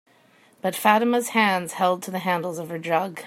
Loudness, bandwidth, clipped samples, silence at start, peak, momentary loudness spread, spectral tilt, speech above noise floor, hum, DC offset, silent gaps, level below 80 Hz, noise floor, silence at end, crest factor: -23 LUFS; 16 kHz; under 0.1%; 0.65 s; -2 dBFS; 10 LU; -4 dB/octave; 34 dB; none; under 0.1%; none; -74 dBFS; -57 dBFS; 0 s; 22 dB